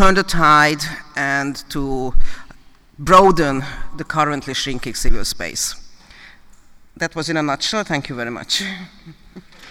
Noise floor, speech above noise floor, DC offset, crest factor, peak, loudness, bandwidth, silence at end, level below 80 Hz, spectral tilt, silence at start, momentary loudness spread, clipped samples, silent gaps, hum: -44 dBFS; 28 dB; under 0.1%; 16 dB; 0 dBFS; -18 LUFS; 15 kHz; 0 s; -28 dBFS; -3.5 dB/octave; 0 s; 17 LU; under 0.1%; none; none